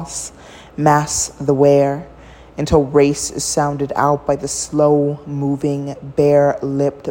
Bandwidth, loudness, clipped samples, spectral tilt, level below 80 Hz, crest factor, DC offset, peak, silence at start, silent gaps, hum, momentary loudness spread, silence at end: 16.5 kHz; -16 LUFS; under 0.1%; -5 dB/octave; -40 dBFS; 16 dB; under 0.1%; 0 dBFS; 0 s; none; none; 12 LU; 0 s